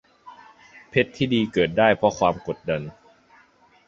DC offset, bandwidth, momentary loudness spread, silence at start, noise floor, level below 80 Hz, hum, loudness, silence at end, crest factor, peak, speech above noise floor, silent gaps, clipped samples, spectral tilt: under 0.1%; 7.8 kHz; 10 LU; 0.25 s; -57 dBFS; -54 dBFS; none; -22 LUFS; 0.95 s; 22 dB; -2 dBFS; 35 dB; none; under 0.1%; -6 dB/octave